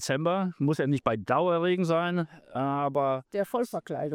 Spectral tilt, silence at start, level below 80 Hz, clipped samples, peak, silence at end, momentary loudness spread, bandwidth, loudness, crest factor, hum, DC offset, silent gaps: -6.5 dB/octave; 0 s; -66 dBFS; under 0.1%; -10 dBFS; 0 s; 7 LU; 16.5 kHz; -28 LUFS; 18 dB; none; under 0.1%; none